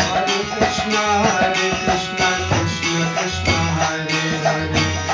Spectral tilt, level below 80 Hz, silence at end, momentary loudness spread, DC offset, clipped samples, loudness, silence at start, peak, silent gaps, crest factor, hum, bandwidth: -3.5 dB/octave; -36 dBFS; 0 s; 3 LU; under 0.1%; under 0.1%; -18 LUFS; 0 s; -4 dBFS; none; 14 dB; none; 7.6 kHz